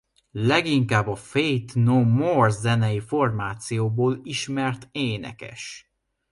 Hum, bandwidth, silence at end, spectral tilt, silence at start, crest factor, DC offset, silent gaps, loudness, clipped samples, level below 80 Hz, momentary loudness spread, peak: none; 11.5 kHz; 0.5 s; -6 dB/octave; 0.35 s; 18 dB; under 0.1%; none; -23 LUFS; under 0.1%; -56 dBFS; 16 LU; -6 dBFS